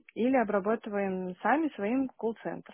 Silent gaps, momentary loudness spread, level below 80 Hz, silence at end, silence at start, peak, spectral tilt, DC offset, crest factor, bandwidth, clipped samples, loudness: none; 7 LU; -70 dBFS; 0 s; 0.15 s; -14 dBFS; -5.5 dB/octave; under 0.1%; 16 dB; 3.5 kHz; under 0.1%; -30 LUFS